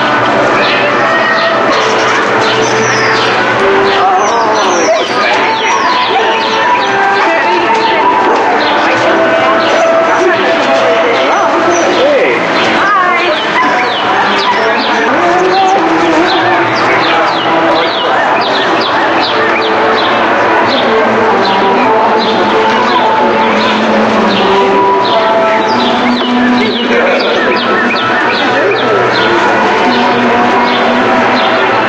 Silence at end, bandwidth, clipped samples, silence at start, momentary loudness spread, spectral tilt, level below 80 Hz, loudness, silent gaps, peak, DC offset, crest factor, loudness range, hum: 0 s; 9.4 kHz; under 0.1%; 0 s; 1 LU; -3.5 dB/octave; -48 dBFS; -8 LUFS; none; 0 dBFS; under 0.1%; 8 dB; 1 LU; none